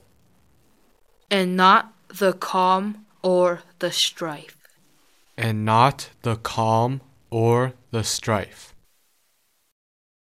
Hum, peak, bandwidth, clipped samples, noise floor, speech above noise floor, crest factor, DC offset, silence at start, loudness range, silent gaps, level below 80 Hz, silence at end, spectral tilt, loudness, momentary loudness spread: none; -4 dBFS; 16 kHz; under 0.1%; -68 dBFS; 47 dB; 20 dB; under 0.1%; 1.3 s; 4 LU; none; -60 dBFS; 1.7 s; -4.5 dB/octave; -22 LUFS; 13 LU